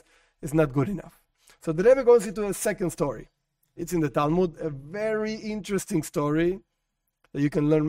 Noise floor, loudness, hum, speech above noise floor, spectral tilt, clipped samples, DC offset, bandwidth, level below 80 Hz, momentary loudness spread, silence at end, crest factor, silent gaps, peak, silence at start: -79 dBFS; -25 LUFS; none; 54 dB; -6.5 dB/octave; under 0.1%; under 0.1%; 16 kHz; -50 dBFS; 15 LU; 0 s; 18 dB; none; -8 dBFS; 0.4 s